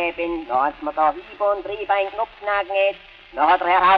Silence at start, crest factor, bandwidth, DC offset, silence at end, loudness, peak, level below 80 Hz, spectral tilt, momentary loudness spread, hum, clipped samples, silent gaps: 0 s; 18 dB; 5.6 kHz; under 0.1%; 0 s; -21 LUFS; -4 dBFS; -52 dBFS; -6 dB/octave; 9 LU; none; under 0.1%; none